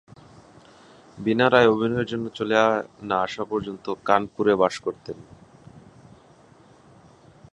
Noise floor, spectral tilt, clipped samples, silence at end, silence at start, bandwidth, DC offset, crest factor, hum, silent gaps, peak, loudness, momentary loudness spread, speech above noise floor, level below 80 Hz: -53 dBFS; -6 dB/octave; under 0.1%; 1.75 s; 1.15 s; 11 kHz; under 0.1%; 24 dB; none; none; -2 dBFS; -23 LUFS; 14 LU; 30 dB; -58 dBFS